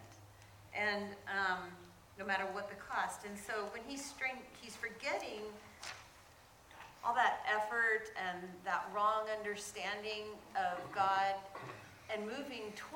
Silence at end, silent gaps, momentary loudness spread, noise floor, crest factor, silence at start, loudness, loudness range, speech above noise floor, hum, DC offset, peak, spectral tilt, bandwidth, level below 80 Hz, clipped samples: 0 s; none; 18 LU; -62 dBFS; 22 dB; 0 s; -39 LUFS; 7 LU; 22 dB; none; under 0.1%; -18 dBFS; -3 dB/octave; 18 kHz; -72 dBFS; under 0.1%